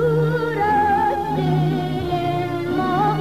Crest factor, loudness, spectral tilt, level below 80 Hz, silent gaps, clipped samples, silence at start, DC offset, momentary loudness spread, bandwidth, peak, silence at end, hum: 10 dB; -20 LUFS; -8 dB/octave; -44 dBFS; none; under 0.1%; 0 s; 0.6%; 5 LU; 15 kHz; -8 dBFS; 0 s; none